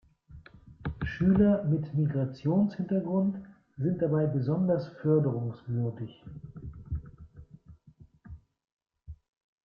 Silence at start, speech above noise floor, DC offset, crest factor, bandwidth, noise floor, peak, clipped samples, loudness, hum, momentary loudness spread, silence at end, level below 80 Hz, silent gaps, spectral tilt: 0.3 s; 30 dB; under 0.1%; 18 dB; 5.6 kHz; -57 dBFS; -12 dBFS; under 0.1%; -29 LUFS; none; 18 LU; 0.55 s; -52 dBFS; 8.72-8.77 s; -11 dB/octave